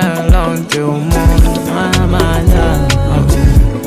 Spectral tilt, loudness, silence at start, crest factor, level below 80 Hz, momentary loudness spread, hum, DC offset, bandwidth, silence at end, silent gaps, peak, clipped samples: -6 dB/octave; -12 LUFS; 0 s; 10 dB; -12 dBFS; 5 LU; none; under 0.1%; 15.5 kHz; 0 s; none; 0 dBFS; under 0.1%